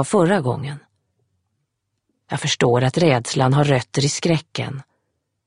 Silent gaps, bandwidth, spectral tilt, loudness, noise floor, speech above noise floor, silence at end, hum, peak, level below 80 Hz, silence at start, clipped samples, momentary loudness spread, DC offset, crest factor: none; 11 kHz; -5 dB/octave; -19 LUFS; -75 dBFS; 56 dB; 0.65 s; none; -2 dBFS; -54 dBFS; 0 s; under 0.1%; 13 LU; under 0.1%; 20 dB